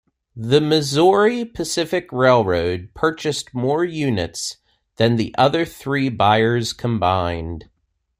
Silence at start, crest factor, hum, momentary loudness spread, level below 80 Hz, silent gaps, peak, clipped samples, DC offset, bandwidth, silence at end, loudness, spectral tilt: 0.35 s; 18 dB; none; 10 LU; -50 dBFS; none; -2 dBFS; under 0.1%; under 0.1%; 16 kHz; 0.55 s; -19 LUFS; -5 dB/octave